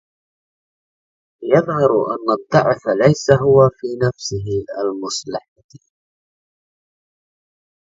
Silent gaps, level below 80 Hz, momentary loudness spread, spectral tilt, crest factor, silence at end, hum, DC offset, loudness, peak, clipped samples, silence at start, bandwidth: 5.48-5.56 s, 5.64-5.69 s; -50 dBFS; 12 LU; -6 dB/octave; 18 dB; 2.2 s; none; under 0.1%; -17 LUFS; 0 dBFS; under 0.1%; 1.4 s; 7.8 kHz